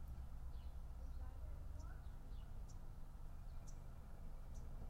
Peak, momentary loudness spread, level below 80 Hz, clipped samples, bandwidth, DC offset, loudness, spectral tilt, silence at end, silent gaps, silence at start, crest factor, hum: -40 dBFS; 4 LU; -52 dBFS; under 0.1%; 15.5 kHz; under 0.1%; -57 LUFS; -6.5 dB/octave; 0 s; none; 0 s; 10 dB; none